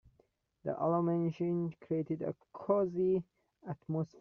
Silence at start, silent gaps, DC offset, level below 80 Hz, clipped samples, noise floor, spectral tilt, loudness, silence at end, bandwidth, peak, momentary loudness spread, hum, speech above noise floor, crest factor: 0.65 s; none; under 0.1%; -72 dBFS; under 0.1%; -73 dBFS; -10 dB/octave; -35 LUFS; 0.15 s; 6.2 kHz; -18 dBFS; 13 LU; none; 39 dB; 18 dB